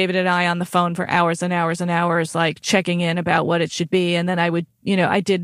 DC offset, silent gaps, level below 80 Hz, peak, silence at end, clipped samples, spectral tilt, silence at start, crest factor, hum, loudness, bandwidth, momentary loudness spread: under 0.1%; none; -62 dBFS; -2 dBFS; 0 s; under 0.1%; -5 dB/octave; 0 s; 16 dB; none; -19 LUFS; 13.5 kHz; 3 LU